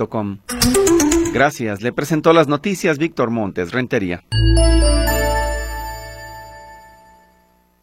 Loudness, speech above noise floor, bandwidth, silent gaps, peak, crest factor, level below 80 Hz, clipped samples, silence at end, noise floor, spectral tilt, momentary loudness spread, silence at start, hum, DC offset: -17 LUFS; 40 dB; 16.5 kHz; none; 0 dBFS; 18 dB; -24 dBFS; under 0.1%; 1.05 s; -56 dBFS; -5 dB/octave; 16 LU; 0 s; none; under 0.1%